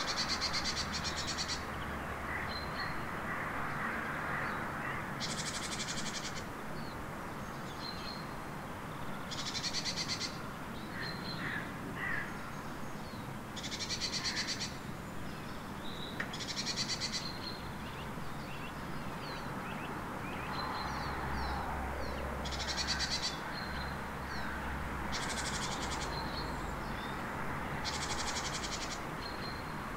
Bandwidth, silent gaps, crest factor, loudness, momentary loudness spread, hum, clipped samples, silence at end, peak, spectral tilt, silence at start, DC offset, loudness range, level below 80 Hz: 16 kHz; none; 18 dB; -38 LUFS; 9 LU; none; under 0.1%; 0 s; -22 dBFS; -3 dB/octave; 0 s; under 0.1%; 4 LU; -50 dBFS